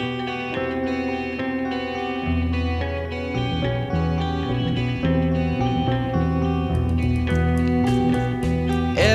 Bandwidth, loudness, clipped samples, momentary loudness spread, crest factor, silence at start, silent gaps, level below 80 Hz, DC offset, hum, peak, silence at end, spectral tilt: 11.5 kHz; -23 LUFS; under 0.1%; 6 LU; 18 dB; 0 s; none; -32 dBFS; under 0.1%; none; -4 dBFS; 0 s; -7 dB/octave